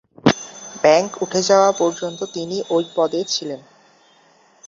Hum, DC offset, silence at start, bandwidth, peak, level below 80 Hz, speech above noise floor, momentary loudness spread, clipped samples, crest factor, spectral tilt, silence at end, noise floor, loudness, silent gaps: none; under 0.1%; 0.25 s; 7.8 kHz; -2 dBFS; -58 dBFS; 36 dB; 12 LU; under 0.1%; 18 dB; -4 dB/octave; 1.1 s; -54 dBFS; -19 LUFS; none